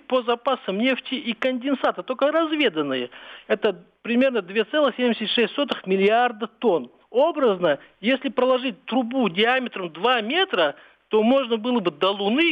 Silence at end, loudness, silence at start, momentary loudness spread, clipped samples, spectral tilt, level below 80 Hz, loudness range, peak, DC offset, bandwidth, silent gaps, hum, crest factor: 0 s; -22 LUFS; 0.1 s; 6 LU; under 0.1%; -6.5 dB/octave; -72 dBFS; 2 LU; -8 dBFS; under 0.1%; 6.2 kHz; none; none; 14 dB